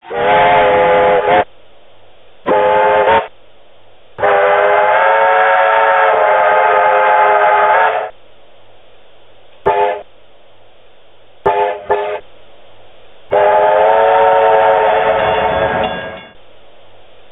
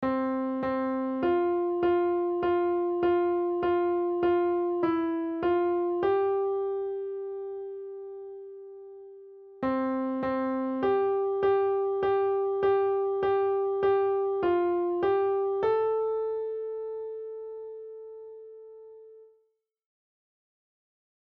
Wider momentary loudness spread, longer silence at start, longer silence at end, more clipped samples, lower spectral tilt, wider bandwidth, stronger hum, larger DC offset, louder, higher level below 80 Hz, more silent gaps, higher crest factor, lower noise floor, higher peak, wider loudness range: second, 10 LU vs 17 LU; about the same, 0.05 s vs 0 s; second, 1.05 s vs 2.15 s; neither; second, -6.5 dB/octave vs -9 dB/octave; second, 4 kHz vs 4.7 kHz; neither; neither; first, -11 LUFS vs -28 LUFS; first, -46 dBFS vs -64 dBFS; neither; about the same, 14 dB vs 14 dB; second, -47 dBFS vs -73 dBFS; first, 0 dBFS vs -16 dBFS; about the same, 10 LU vs 10 LU